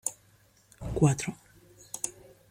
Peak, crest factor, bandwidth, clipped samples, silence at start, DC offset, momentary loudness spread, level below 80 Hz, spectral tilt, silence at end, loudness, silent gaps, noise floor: -10 dBFS; 22 dB; 16.5 kHz; under 0.1%; 0.05 s; under 0.1%; 17 LU; -50 dBFS; -5.5 dB/octave; 0.4 s; -30 LUFS; none; -63 dBFS